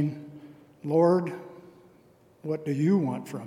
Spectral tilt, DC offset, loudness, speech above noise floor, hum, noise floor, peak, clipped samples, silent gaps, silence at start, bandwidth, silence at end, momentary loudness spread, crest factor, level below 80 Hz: -9 dB/octave; under 0.1%; -26 LUFS; 33 dB; none; -59 dBFS; -10 dBFS; under 0.1%; none; 0 s; 15 kHz; 0 s; 23 LU; 18 dB; -76 dBFS